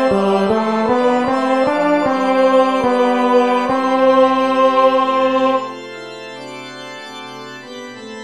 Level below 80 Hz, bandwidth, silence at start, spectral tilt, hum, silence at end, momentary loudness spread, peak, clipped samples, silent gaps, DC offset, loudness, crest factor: -54 dBFS; 11 kHz; 0 s; -5.5 dB/octave; none; 0 s; 18 LU; 0 dBFS; under 0.1%; none; 0.5%; -14 LUFS; 16 dB